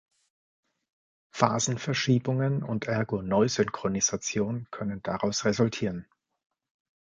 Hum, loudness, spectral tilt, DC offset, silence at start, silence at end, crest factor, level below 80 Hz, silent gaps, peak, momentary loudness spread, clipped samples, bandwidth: none; -28 LUFS; -4.5 dB/octave; under 0.1%; 1.35 s; 1.05 s; 24 dB; -60 dBFS; none; -4 dBFS; 8 LU; under 0.1%; 9.4 kHz